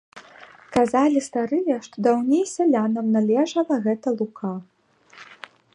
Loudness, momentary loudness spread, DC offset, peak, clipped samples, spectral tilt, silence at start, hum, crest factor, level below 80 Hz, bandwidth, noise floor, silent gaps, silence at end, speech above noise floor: -22 LUFS; 12 LU; under 0.1%; -6 dBFS; under 0.1%; -6 dB/octave; 0.15 s; none; 18 dB; -64 dBFS; 11 kHz; -49 dBFS; none; 0.4 s; 28 dB